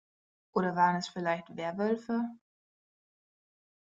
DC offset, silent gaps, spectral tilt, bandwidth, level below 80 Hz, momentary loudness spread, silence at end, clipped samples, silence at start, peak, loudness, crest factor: under 0.1%; none; -6 dB/octave; 7.8 kHz; -78 dBFS; 8 LU; 1.6 s; under 0.1%; 0.55 s; -14 dBFS; -32 LUFS; 22 dB